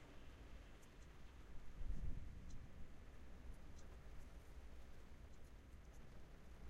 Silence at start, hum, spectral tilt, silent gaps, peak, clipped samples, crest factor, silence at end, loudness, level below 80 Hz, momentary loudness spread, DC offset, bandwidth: 0 s; none; -6 dB/octave; none; -34 dBFS; under 0.1%; 18 dB; 0 s; -61 LUFS; -56 dBFS; 9 LU; under 0.1%; 11 kHz